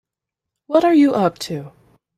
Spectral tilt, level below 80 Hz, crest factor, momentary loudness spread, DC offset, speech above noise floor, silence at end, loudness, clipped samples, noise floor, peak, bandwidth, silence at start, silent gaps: -6 dB/octave; -62 dBFS; 16 dB; 14 LU; under 0.1%; 68 dB; 0.5 s; -16 LUFS; under 0.1%; -84 dBFS; -4 dBFS; 14 kHz; 0.7 s; none